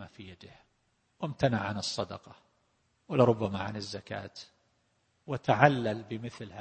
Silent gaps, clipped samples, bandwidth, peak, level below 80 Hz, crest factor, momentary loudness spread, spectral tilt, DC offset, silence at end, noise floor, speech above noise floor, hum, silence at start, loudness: none; under 0.1%; 8.8 kHz; -4 dBFS; -64 dBFS; 28 dB; 22 LU; -6 dB/octave; under 0.1%; 0 s; -73 dBFS; 43 dB; none; 0 s; -30 LUFS